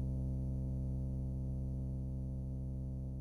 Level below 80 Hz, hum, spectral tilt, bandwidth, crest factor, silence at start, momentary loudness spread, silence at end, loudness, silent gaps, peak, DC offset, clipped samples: -42 dBFS; none; -11.5 dB/octave; 1.4 kHz; 8 dB; 0 s; 3 LU; 0 s; -41 LUFS; none; -30 dBFS; under 0.1%; under 0.1%